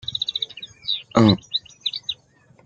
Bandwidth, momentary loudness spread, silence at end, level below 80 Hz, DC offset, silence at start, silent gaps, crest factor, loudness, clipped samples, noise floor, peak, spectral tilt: 7.8 kHz; 14 LU; 0.5 s; -56 dBFS; under 0.1%; 0.05 s; none; 22 dB; -22 LUFS; under 0.1%; -55 dBFS; -2 dBFS; -6 dB/octave